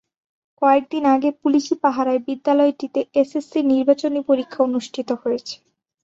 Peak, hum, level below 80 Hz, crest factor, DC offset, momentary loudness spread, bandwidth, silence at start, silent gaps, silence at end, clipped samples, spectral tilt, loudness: -4 dBFS; none; -66 dBFS; 16 dB; under 0.1%; 8 LU; 7.8 kHz; 0.6 s; none; 0.5 s; under 0.1%; -4.5 dB/octave; -20 LUFS